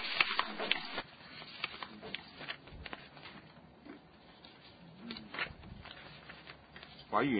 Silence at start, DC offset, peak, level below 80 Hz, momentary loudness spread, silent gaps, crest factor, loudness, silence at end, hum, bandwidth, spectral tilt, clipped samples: 0 s; under 0.1%; -10 dBFS; -64 dBFS; 21 LU; none; 32 dB; -39 LUFS; 0 s; none; 4.9 kHz; -1 dB/octave; under 0.1%